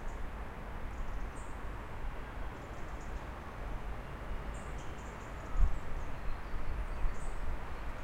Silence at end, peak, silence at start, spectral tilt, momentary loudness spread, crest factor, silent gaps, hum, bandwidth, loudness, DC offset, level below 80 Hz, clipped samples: 0 s; -16 dBFS; 0 s; -6 dB/octave; 5 LU; 20 dB; none; none; 9.4 kHz; -44 LUFS; under 0.1%; -38 dBFS; under 0.1%